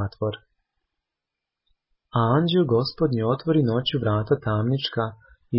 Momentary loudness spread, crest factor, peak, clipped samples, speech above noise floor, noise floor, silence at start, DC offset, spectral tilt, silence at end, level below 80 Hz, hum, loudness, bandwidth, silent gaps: 9 LU; 16 dB; -8 dBFS; under 0.1%; 64 dB; -86 dBFS; 0 s; under 0.1%; -11.5 dB/octave; 0 s; -52 dBFS; none; -23 LUFS; 5.8 kHz; none